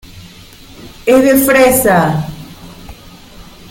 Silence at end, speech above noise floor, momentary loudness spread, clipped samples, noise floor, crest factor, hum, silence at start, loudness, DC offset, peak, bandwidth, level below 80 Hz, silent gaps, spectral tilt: 0.3 s; 27 dB; 24 LU; under 0.1%; -37 dBFS; 14 dB; none; 0.15 s; -10 LUFS; under 0.1%; 0 dBFS; 17 kHz; -38 dBFS; none; -5 dB/octave